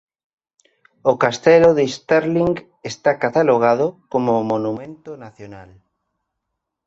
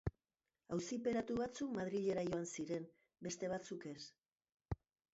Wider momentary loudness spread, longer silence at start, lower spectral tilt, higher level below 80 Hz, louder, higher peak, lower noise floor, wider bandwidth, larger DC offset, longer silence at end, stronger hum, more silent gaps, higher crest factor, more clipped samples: first, 23 LU vs 12 LU; first, 1.05 s vs 0.05 s; about the same, -6 dB/octave vs -6 dB/octave; first, -56 dBFS vs -64 dBFS; first, -17 LUFS vs -44 LUFS; first, -2 dBFS vs -28 dBFS; second, -79 dBFS vs under -90 dBFS; about the same, 7.8 kHz vs 7.6 kHz; neither; first, 1.25 s vs 0.4 s; neither; second, none vs 4.54-4.58 s; about the same, 18 dB vs 16 dB; neither